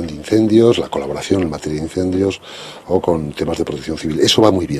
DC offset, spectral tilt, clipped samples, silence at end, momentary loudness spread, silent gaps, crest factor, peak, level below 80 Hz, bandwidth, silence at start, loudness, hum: under 0.1%; -5.5 dB/octave; under 0.1%; 0 s; 11 LU; none; 16 dB; 0 dBFS; -42 dBFS; 13.5 kHz; 0 s; -16 LUFS; none